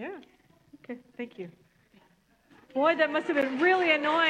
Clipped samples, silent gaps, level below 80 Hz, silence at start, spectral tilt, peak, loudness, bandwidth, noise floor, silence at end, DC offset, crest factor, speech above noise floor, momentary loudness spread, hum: under 0.1%; none; -76 dBFS; 0 s; -4.5 dB/octave; -10 dBFS; -25 LUFS; 9.6 kHz; -65 dBFS; 0 s; under 0.1%; 20 dB; 39 dB; 21 LU; none